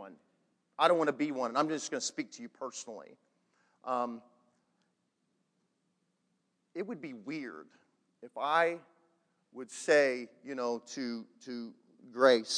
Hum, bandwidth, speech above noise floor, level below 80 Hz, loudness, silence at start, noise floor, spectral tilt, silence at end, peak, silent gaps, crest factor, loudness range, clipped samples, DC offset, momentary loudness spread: none; 10.5 kHz; 46 dB; under -90 dBFS; -33 LUFS; 0 s; -79 dBFS; -3 dB/octave; 0 s; -10 dBFS; none; 24 dB; 13 LU; under 0.1%; under 0.1%; 21 LU